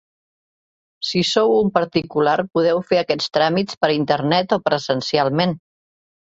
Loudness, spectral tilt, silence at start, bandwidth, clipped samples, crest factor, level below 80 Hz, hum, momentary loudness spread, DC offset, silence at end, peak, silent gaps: -19 LUFS; -5.5 dB/octave; 1 s; 8 kHz; under 0.1%; 18 dB; -58 dBFS; none; 4 LU; under 0.1%; 0.75 s; -2 dBFS; 3.77-3.81 s